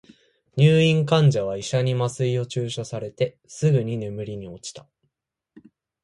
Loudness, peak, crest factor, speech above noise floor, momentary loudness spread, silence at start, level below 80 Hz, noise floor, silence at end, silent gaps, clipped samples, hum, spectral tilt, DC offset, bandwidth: -22 LUFS; -6 dBFS; 18 dB; 58 dB; 16 LU; 0.55 s; -58 dBFS; -80 dBFS; 1.25 s; none; under 0.1%; none; -6.5 dB/octave; under 0.1%; 11 kHz